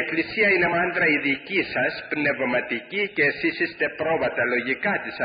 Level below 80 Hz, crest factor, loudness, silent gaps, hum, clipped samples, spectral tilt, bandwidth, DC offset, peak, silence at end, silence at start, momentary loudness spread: -60 dBFS; 14 dB; -22 LUFS; none; none; under 0.1%; -9.5 dB/octave; 5.2 kHz; under 0.1%; -10 dBFS; 0 s; 0 s; 6 LU